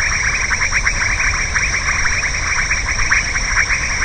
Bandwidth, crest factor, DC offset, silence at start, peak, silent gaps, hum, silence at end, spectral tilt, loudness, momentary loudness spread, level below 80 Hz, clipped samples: 9.4 kHz; 16 dB; 0.3%; 0 s; 0 dBFS; none; none; 0 s; -1 dB/octave; -15 LUFS; 2 LU; -26 dBFS; under 0.1%